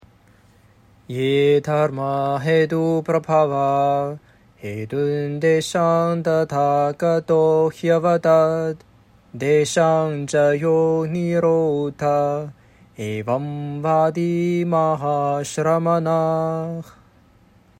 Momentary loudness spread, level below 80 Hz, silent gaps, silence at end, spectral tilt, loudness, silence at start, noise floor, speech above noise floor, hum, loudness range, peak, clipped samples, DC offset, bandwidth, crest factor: 10 LU; -60 dBFS; none; 0.9 s; -6.5 dB/octave; -20 LUFS; 1.1 s; -53 dBFS; 34 dB; none; 3 LU; -4 dBFS; under 0.1%; under 0.1%; 15.5 kHz; 16 dB